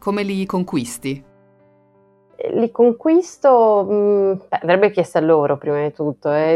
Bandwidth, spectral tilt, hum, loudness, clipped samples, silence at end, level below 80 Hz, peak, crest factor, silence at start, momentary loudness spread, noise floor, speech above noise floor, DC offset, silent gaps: 13.5 kHz; -6.5 dB/octave; none; -17 LUFS; under 0.1%; 0 s; -60 dBFS; -2 dBFS; 16 dB; 0.05 s; 10 LU; -55 dBFS; 38 dB; under 0.1%; none